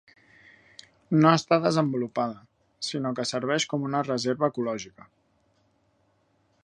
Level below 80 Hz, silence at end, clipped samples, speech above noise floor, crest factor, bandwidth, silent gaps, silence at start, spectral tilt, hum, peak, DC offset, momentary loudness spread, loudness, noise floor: -70 dBFS; 1.75 s; under 0.1%; 43 dB; 24 dB; 10.5 kHz; none; 1.1 s; -5.5 dB/octave; none; -4 dBFS; under 0.1%; 13 LU; -26 LUFS; -68 dBFS